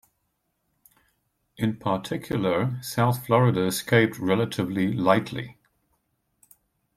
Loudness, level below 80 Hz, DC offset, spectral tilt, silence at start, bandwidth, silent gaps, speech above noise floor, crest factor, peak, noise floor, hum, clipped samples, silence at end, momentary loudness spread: -24 LUFS; -60 dBFS; under 0.1%; -6 dB/octave; 1.6 s; 15.5 kHz; none; 52 dB; 22 dB; -4 dBFS; -75 dBFS; none; under 0.1%; 1.45 s; 8 LU